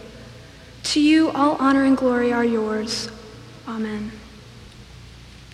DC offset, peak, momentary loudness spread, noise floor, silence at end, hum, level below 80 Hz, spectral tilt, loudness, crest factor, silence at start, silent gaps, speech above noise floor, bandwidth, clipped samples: under 0.1%; -6 dBFS; 24 LU; -43 dBFS; 0.05 s; none; -50 dBFS; -4.5 dB/octave; -20 LUFS; 16 dB; 0 s; none; 23 dB; 12.5 kHz; under 0.1%